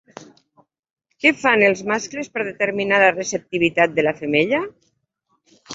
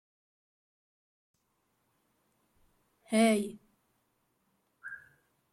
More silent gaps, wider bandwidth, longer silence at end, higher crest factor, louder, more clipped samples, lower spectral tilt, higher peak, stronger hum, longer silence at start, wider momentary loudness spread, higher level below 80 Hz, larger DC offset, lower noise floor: first, 0.79-0.83 s, 0.91-0.96 s vs none; second, 8 kHz vs 13.5 kHz; second, 0 s vs 0.55 s; about the same, 20 dB vs 22 dB; first, -18 LUFS vs -29 LUFS; neither; about the same, -4 dB/octave vs -4.5 dB/octave; first, -2 dBFS vs -16 dBFS; neither; second, 0.2 s vs 3.1 s; second, 10 LU vs 23 LU; first, -62 dBFS vs -78 dBFS; neither; second, -69 dBFS vs -78 dBFS